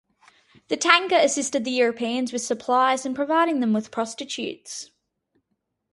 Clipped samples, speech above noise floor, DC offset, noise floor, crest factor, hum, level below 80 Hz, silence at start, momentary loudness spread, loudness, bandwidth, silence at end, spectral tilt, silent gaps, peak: under 0.1%; 54 dB; under 0.1%; -77 dBFS; 24 dB; none; -72 dBFS; 0.7 s; 13 LU; -22 LUFS; 11.5 kHz; 1.1 s; -2.5 dB/octave; none; 0 dBFS